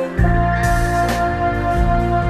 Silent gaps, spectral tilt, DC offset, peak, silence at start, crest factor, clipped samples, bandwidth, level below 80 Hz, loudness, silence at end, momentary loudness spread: none; -6.5 dB/octave; under 0.1%; -4 dBFS; 0 s; 12 dB; under 0.1%; 14 kHz; -22 dBFS; -17 LUFS; 0 s; 2 LU